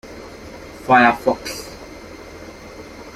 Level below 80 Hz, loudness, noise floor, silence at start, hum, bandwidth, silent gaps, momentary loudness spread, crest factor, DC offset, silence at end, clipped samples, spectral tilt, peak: -48 dBFS; -16 LUFS; -37 dBFS; 0.05 s; none; 15.5 kHz; none; 24 LU; 20 dB; under 0.1%; 0.05 s; under 0.1%; -4.5 dB/octave; -2 dBFS